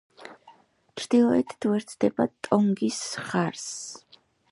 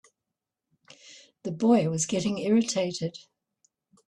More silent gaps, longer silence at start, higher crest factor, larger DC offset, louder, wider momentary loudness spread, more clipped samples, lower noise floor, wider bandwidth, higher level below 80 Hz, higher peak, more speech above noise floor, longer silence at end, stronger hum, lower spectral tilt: neither; second, 0.2 s vs 1.05 s; about the same, 20 dB vs 18 dB; neither; about the same, -26 LUFS vs -26 LUFS; first, 22 LU vs 16 LU; neither; second, -57 dBFS vs -87 dBFS; about the same, 11.5 kHz vs 11 kHz; about the same, -68 dBFS vs -68 dBFS; first, -6 dBFS vs -10 dBFS; second, 32 dB vs 61 dB; second, 0.55 s vs 0.85 s; neither; about the same, -5 dB/octave vs -5 dB/octave